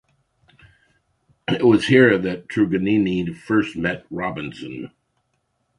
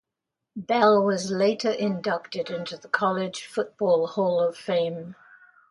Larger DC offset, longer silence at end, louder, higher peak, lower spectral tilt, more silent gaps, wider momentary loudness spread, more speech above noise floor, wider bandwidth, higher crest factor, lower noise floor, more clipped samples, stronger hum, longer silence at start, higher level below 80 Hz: neither; first, 0.9 s vs 0.55 s; first, -19 LUFS vs -25 LUFS; first, 0 dBFS vs -6 dBFS; first, -7 dB/octave vs -5 dB/octave; neither; first, 18 LU vs 12 LU; second, 51 dB vs 61 dB; about the same, 11 kHz vs 11.5 kHz; about the same, 20 dB vs 18 dB; second, -71 dBFS vs -85 dBFS; neither; neither; first, 1.5 s vs 0.55 s; first, -52 dBFS vs -72 dBFS